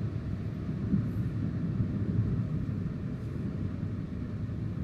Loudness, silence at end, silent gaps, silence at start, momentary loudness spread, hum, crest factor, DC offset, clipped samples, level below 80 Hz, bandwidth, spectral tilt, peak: -33 LUFS; 0 s; none; 0 s; 6 LU; none; 16 dB; under 0.1%; under 0.1%; -44 dBFS; 6.4 kHz; -10 dB/octave; -18 dBFS